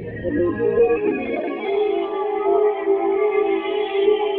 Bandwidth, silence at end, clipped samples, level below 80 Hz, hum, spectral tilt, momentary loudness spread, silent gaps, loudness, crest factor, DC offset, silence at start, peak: 4.1 kHz; 0 s; under 0.1%; -50 dBFS; none; -9.5 dB/octave; 5 LU; none; -20 LUFS; 14 dB; under 0.1%; 0 s; -6 dBFS